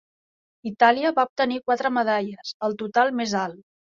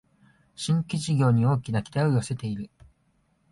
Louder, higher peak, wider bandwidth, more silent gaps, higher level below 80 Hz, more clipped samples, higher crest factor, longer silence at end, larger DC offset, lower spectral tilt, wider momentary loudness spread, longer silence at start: first, -23 LUFS vs -26 LUFS; first, -4 dBFS vs -10 dBFS; second, 7.4 kHz vs 11.5 kHz; first, 1.29-1.36 s, 2.54-2.60 s vs none; second, -70 dBFS vs -56 dBFS; neither; about the same, 20 dB vs 16 dB; second, 0.4 s vs 0.85 s; neither; second, -4.5 dB/octave vs -6.5 dB/octave; about the same, 13 LU vs 13 LU; about the same, 0.65 s vs 0.6 s